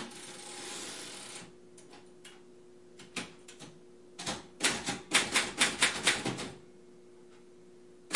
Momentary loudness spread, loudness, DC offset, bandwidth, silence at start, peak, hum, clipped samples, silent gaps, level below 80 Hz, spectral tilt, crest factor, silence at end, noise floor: 26 LU; -32 LUFS; 0.1%; 11.5 kHz; 0 s; -10 dBFS; none; under 0.1%; none; -68 dBFS; -1 dB/octave; 26 dB; 0 s; -56 dBFS